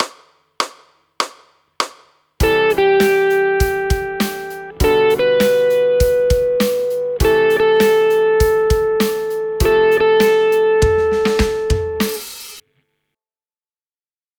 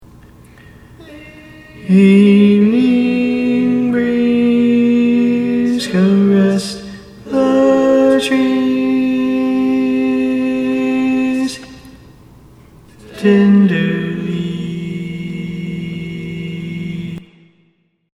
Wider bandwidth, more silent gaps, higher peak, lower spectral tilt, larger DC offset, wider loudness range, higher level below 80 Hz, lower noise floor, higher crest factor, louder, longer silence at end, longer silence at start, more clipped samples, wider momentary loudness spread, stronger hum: first, over 20 kHz vs 11.5 kHz; neither; about the same, 0 dBFS vs 0 dBFS; second, -5 dB/octave vs -7 dB/octave; neither; second, 4 LU vs 8 LU; first, -28 dBFS vs -48 dBFS; first, under -90 dBFS vs -58 dBFS; about the same, 16 dB vs 14 dB; about the same, -15 LUFS vs -14 LUFS; first, 1.8 s vs 0.95 s; second, 0 s vs 1 s; neither; second, 11 LU vs 15 LU; neither